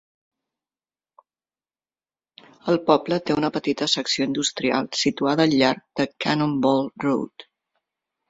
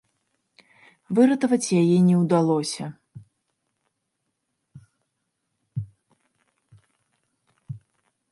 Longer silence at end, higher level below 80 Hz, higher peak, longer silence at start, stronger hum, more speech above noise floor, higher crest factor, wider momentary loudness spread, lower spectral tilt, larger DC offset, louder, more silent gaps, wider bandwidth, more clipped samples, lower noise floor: first, 0.85 s vs 0.55 s; about the same, -62 dBFS vs -66 dBFS; about the same, -4 dBFS vs -6 dBFS; first, 2.65 s vs 1.1 s; neither; first, over 68 dB vs 58 dB; about the same, 22 dB vs 20 dB; second, 6 LU vs 23 LU; second, -4.5 dB/octave vs -6.5 dB/octave; neither; about the same, -22 LUFS vs -21 LUFS; neither; second, 8 kHz vs 11.5 kHz; neither; first, under -90 dBFS vs -78 dBFS